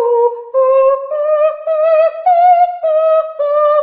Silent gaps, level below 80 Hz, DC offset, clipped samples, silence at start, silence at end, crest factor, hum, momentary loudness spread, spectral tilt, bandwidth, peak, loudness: none; -64 dBFS; under 0.1%; under 0.1%; 0 s; 0 s; 10 dB; none; 5 LU; -6 dB/octave; 4.8 kHz; -2 dBFS; -12 LUFS